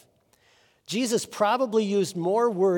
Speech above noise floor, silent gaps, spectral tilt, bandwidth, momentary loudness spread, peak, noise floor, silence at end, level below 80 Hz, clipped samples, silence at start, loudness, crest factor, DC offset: 39 dB; none; -4.5 dB/octave; 18 kHz; 5 LU; -10 dBFS; -63 dBFS; 0 s; -78 dBFS; under 0.1%; 0.9 s; -25 LUFS; 16 dB; under 0.1%